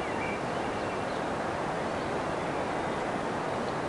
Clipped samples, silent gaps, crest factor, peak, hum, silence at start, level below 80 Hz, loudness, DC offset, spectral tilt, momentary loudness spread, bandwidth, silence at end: under 0.1%; none; 12 dB; -18 dBFS; none; 0 s; -54 dBFS; -32 LUFS; under 0.1%; -5.5 dB/octave; 1 LU; 11.5 kHz; 0 s